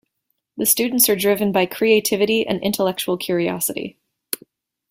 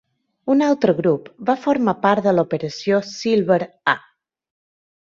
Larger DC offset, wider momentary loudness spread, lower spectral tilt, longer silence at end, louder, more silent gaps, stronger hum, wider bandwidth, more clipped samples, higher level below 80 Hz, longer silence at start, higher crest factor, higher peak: neither; first, 14 LU vs 6 LU; second, -3 dB/octave vs -6 dB/octave; second, 1 s vs 1.15 s; about the same, -18 LUFS vs -19 LUFS; neither; neither; first, 16.5 kHz vs 7.6 kHz; neither; about the same, -60 dBFS vs -62 dBFS; about the same, 0.55 s vs 0.45 s; about the same, 20 dB vs 18 dB; about the same, 0 dBFS vs -2 dBFS